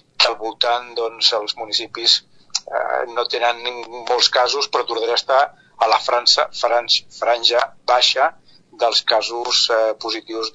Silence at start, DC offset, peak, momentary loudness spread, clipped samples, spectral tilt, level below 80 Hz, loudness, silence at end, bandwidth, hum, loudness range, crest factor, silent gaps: 0.2 s; under 0.1%; 0 dBFS; 9 LU; under 0.1%; 0.5 dB/octave; -66 dBFS; -18 LUFS; 0.05 s; 8.4 kHz; none; 2 LU; 20 dB; none